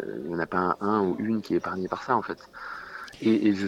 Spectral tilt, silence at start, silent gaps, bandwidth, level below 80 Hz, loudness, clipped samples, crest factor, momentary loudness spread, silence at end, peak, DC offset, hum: -7 dB/octave; 0 s; none; 12 kHz; -62 dBFS; -27 LUFS; under 0.1%; 18 dB; 14 LU; 0 s; -10 dBFS; under 0.1%; none